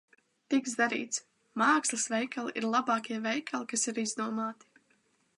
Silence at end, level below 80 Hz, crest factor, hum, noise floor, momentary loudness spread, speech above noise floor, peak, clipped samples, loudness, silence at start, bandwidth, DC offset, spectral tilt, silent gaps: 0.85 s; -86 dBFS; 20 dB; none; -71 dBFS; 9 LU; 40 dB; -12 dBFS; under 0.1%; -31 LUFS; 0.5 s; 11.5 kHz; under 0.1%; -2 dB/octave; none